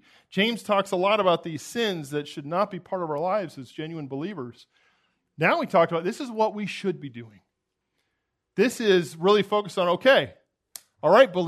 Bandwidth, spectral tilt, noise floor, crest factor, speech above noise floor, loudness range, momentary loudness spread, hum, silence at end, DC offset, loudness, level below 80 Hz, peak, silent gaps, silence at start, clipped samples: 13.5 kHz; -5 dB/octave; -80 dBFS; 22 dB; 56 dB; 6 LU; 16 LU; none; 0 s; under 0.1%; -24 LUFS; -76 dBFS; -4 dBFS; none; 0.35 s; under 0.1%